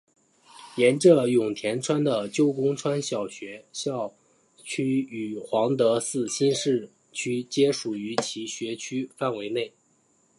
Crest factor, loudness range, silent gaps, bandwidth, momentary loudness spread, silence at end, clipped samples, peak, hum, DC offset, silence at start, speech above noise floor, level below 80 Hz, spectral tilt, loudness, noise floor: 20 dB; 5 LU; none; 11.5 kHz; 12 LU; 0.7 s; under 0.1%; -4 dBFS; none; under 0.1%; 0.55 s; 40 dB; -74 dBFS; -5 dB/octave; -25 LUFS; -65 dBFS